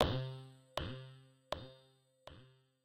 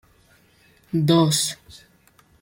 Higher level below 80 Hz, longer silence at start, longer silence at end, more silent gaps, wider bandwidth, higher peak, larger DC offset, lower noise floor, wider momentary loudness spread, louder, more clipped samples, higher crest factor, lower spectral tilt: about the same, -56 dBFS vs -60 dBFS; second, 0 s vs 0.95 s; second, 0.35 s vs 0.65 s; neither; about the same, 16 kHz vs 16.5 kHz; second, -14 dBFS vs -8 dBFS; neither; first, -70 dBFS vs -57 dBFS; first, 19 LU vs 12 LU; second, -44 LUFS vs -20 LUFS; neither; first, 30 dB vs 18 dB; about the same, -6 dB/octave vs -5 dB/octave